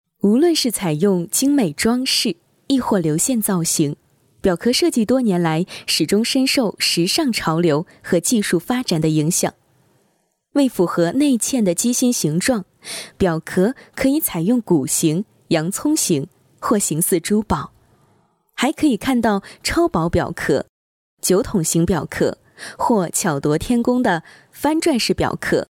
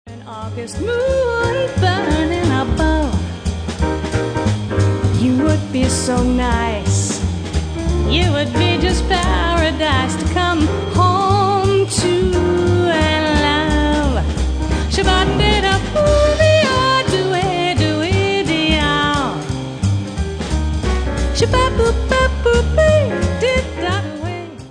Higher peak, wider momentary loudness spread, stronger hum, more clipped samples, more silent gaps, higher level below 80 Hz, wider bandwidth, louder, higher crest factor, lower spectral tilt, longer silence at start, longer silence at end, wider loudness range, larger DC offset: second, -6 dBFS vs -2 dBFS; about the same, 6 LU vs 7 LU; neither; neither; first, 20.69-21.17 s vs none; second, -44 dBFS vs -24 dBFS; first, 18 kHz vs 10 kHz; about the same, -18 LUFS vs -16 LUFS; about the same, 14 dB vs 14 dB; second, -4 dB/octave vs -5.5 dB/octave; first, 0.25 s vs 0.05 s; about the same, 0.05 s vs 0 s; about the same, 3 LU vs 3 LU; neither